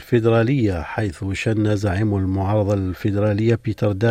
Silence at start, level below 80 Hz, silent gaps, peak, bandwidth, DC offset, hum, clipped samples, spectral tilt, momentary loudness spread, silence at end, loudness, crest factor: 0 s; -46 dBFS; none; -4 dBFS; 13.5 kHz; under 0.1%; none; under 0.1%; -8 dB/octave; 7 LU; 0 s; -20 LUFS; 14 dB